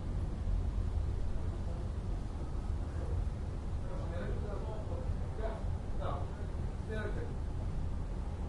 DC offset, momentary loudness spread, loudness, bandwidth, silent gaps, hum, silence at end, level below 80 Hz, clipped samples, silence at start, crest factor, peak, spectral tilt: under 0.1%; 4 LU; -40 LUFS; 11 kHz; none; none; 0 s; -38 dBFS; under 0.1%; 0 s; 12 dB; -24 dBFS; -8 dB/octave